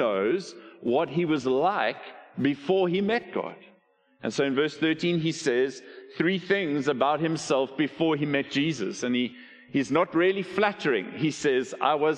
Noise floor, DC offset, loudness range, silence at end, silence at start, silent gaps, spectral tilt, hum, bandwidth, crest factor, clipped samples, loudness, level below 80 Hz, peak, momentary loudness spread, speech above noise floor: -63 dBFS; under 0.1%; 2 LU; 0 s; 0 s; none; -5.5 dB/octave; none; 9.8 kHz; 20 dB; under 0.1%; -26 LUFS; -68 dBFS; -6 dBFS; 8 LU; 37 dB